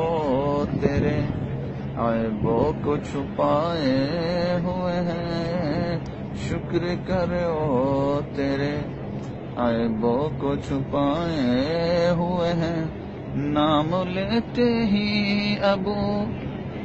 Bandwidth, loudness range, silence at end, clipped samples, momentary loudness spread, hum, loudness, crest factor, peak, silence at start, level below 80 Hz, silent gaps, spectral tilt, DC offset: 8.2 kHz; 2 LU; 0 s; under 0.1%; 8 LU; none; -24 LUFS; 20 dB; -4 dBFS; 0 s; -42 dBFS; none; -7.5 dB/octave; under 0.1%